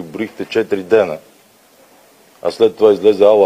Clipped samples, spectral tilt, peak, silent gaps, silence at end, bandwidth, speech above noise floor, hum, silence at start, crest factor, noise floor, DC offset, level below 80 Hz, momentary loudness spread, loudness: under 0.1%; -6 dB/octave; 0 dBFS; none; 0 s; 14.5 kHz; 36 dB; none; 0 s; 14 dB; -49 dBFS; under 0.1%; -60 dBFS; 13 LU; -15 LUFS